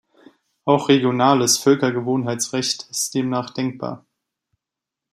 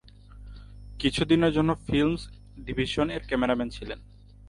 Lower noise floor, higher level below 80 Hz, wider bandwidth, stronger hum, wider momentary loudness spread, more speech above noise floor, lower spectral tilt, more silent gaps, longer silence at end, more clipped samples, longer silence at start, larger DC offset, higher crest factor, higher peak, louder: first, -86 dBFS vs -47 dBFS; second, -66 dBFS vs -44 dBFS; first, 15.5 kHz vs 11.5 kHz; neither; second, 12 LU vs 25 LU; first, 67 dB vs 21 dB; second, -4 dB/octave vs -6 dB/octave; neither; first, 1.15 s vs 0 s; neither; first, 0.65 s vs 0.05 s; neither; about the same, 20 dB vs 18 dB; first, -2 dBFS vs -10 dBFS; first, -19 LUFS vs -26 LUFS